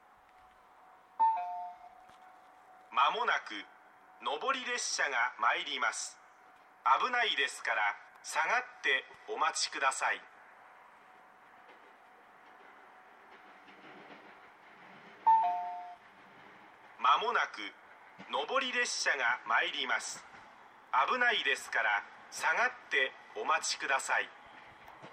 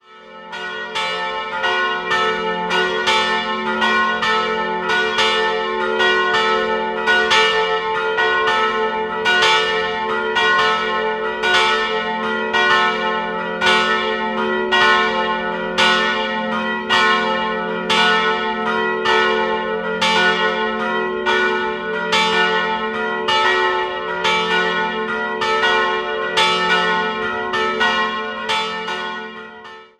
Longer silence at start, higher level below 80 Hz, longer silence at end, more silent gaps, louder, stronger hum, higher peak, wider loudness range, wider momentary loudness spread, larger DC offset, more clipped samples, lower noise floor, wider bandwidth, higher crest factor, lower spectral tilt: first, 1.2 s vs 0.1 s; second, -86 dBFS vs -52 dBFS; second, 0 s vs 0.15 s; neither; second, -32 LUFS vs -17 LUFS; neither; second, -14 dBFS vs 0 dBFS; first, 5 LU vs 2 LU; first, 23 LU vs 7 LU; neither; neither; first, -61 dBFS vs -38 dBFS; first, 15 kHz vs 13 kHz; about the same, 20 dB vs 18 dB; second, 0.5 dB/octave vs -2.5 dB/octave